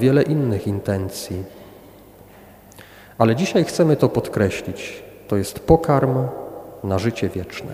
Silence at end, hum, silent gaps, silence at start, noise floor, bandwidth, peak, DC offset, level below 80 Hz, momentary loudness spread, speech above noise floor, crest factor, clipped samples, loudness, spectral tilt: 0 s; 50 Hz at -45 dBFS; none; 0 s; -45 dBFS; 16.5 kHz; 0 dBFS; under 0.1%; -42 dBFS; 15 LU; 26 dB; 20 dB; under 0.1%; -20 LUFS; -6.5 dB/octave